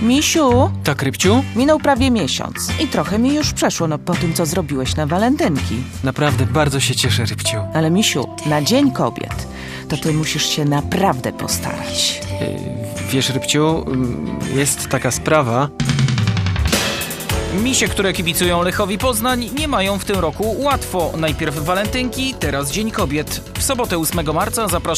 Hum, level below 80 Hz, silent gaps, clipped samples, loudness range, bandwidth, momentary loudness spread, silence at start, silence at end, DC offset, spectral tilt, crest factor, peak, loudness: none; -34 dBFS; none; under 0.1%; 3 LU; 15.5 kHz; 7 LU; 0 s; 0 s; under 0.1%; -4.5 dB/octave; 18 dB; 0 dBFS; -17 LUFS